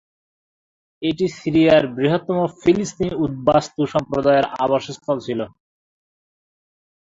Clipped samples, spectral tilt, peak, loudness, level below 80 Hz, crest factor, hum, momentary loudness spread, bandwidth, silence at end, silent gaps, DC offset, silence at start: under 0.1%; -6 dB/octave; 0 dBFS; -19 LUFS; -52 dBFS; 20 dB; none; 10 LU; 7.8 kHz; 1.55 s; none; under 0.1%; 1 s